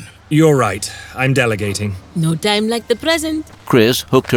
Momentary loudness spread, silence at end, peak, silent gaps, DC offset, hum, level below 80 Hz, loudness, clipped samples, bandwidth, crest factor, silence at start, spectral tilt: 10 LU; 0 s; 0 dBFS; none; under 0.1%; none; -46 dBFS; -16 LUFS; under 0.1%; 19.5 kHz; 16 dB; 0 s; -5 dB/octave